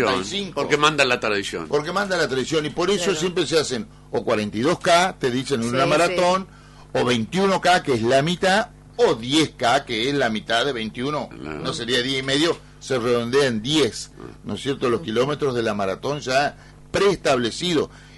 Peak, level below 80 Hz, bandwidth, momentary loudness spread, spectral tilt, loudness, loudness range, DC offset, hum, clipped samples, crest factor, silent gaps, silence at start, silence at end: -4 dBFS; -50 dBFS; 11.5 kHz; 9 LU; -4 dB/octave; -21 LUFS; 3 LU; under 0.1%; 50 Hz at -45 dBFS; under 0.1%; 18 dB; none; 0 s; 0 s